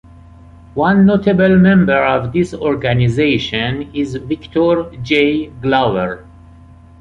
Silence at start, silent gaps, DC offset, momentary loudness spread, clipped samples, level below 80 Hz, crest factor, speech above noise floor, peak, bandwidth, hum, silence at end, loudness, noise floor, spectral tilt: 0.75 s; none; under 0.1%; 11 LU; under 0.1%; -40 dBFS; 14 dB; 27 dB; -2 dBFS; 7.8 kHz; none; 0.8 s; -14 LUFS; -40 dBFS; -7.5 dB/octave